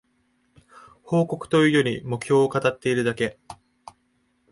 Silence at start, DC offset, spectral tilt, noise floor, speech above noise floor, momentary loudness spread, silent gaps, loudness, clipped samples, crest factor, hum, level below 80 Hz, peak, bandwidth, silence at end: 1.05 s; under 0.1%; -6 dB/octave; -68 dBFS; 46 dB; 10 LU; none; -22 LUFS; under 0.1%; 18 dB; none; -60 dBFS; -8 dBFS; 11.5 kHz; 1 s